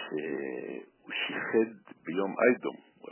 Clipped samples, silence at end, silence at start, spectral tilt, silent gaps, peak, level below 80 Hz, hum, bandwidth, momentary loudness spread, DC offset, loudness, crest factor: under 0.1%; 0 s; 0 s; -2.5 dB/octave; none; -10 dBFS; -90 dBFS; none; 3.2 kHz; 17 LU; under 0.1%; -31 LUFS; 22 dB